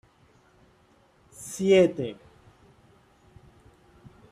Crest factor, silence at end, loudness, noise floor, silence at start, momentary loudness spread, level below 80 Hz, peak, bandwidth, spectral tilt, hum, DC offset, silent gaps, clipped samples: 22 dB; 2.2 s; -24 LUFS; -61 dBFS; 1.4 s; 23 LU; -62 dBFS; -8 dBFS; 14.5 kHz; -5.5 dB/octave; none; under 0.1%; none; under 0.1%